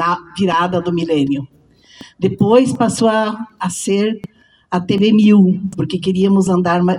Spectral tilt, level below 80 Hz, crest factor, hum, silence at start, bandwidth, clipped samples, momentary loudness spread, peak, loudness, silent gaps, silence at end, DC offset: -6 dB/octave; -52 dBFS; 14 dB; none; 0 s; 12 kHz; under 0.1%; 11 LU; 0 dBFS; -15 LUFS; none; 0 s; under 0.1%